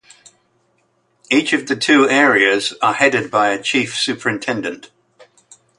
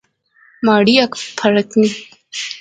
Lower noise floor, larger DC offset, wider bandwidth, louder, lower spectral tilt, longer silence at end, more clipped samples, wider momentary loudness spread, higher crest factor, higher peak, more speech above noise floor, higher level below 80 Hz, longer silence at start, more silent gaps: first, -62 dBFS vs -53 dBFS; neither; first, 11.5 kHz vs 9.2 kHz; about the same, -15 LUFS vs -15 LUFS; second, -3 dB/octave vs -4.5 dB/octave; first, 1 s vs 0 s; neither; second, 10 LU vs 15 LU; about the same, 18 dB vs 16 dB; about the same, 0 dBFS vs 0 dBFS; first, 46 dB vs 38 dB; about the same, -64 dBFS vs -60 dBFS; first, 1.3 s vs 0.6 s; neither